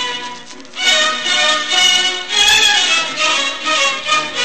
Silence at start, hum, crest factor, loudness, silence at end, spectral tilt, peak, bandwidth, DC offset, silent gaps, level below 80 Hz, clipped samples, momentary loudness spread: 0 s; none; 14 dB; -12 LUFS; 0 s; 1.5 dB/octave; 0 dBFS; 15.5 kHz; 1%; none; -52 dBFS; under 0.1%; 12 LU